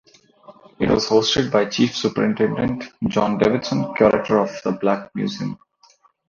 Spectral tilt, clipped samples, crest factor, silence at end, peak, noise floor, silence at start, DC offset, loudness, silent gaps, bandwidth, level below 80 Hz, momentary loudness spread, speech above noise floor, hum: -5.5 dB/octave; under 0.1%; 18 dB; 0.75 s; -2 dBFS; -56 dBFS; 0.5 s; under 0.1%; -20 LUFS; none; 7.4 kHz; -50 dBFS; 9 LU; 37 dB; none